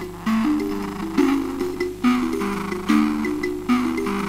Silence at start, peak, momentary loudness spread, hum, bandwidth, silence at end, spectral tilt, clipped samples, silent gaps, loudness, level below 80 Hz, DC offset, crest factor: 0 s; -6 dBFS; 6 LU; 50 Hz at -45 dBFS; 16 kHz; 0 s; -5.5 dB/octave; under 0.1%; none; -22 LUFS; -44 dBFS; under 0.1%; 16 dB